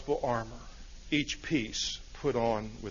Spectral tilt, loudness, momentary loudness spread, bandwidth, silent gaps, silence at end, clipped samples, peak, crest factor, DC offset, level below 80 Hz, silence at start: -4 dB/octave; -33 LUFS; 16 LU; 7.4 kHz; none; 0 s; under 0.1%; -14 dBFS; 20 dB; under 0.1%; -48 dBFS; 0 s